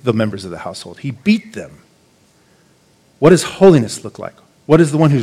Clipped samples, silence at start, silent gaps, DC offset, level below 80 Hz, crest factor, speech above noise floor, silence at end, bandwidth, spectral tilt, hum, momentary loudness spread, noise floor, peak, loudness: under 0.1%; 0.05 s; none; under 0.1%; -50 dBFS; 16 dB; 39 dB; 0 s; 14 kHz; -6.5 dB/octave; none; 22 LU; -53 dBFS; 0 dBFS; -13 LUFS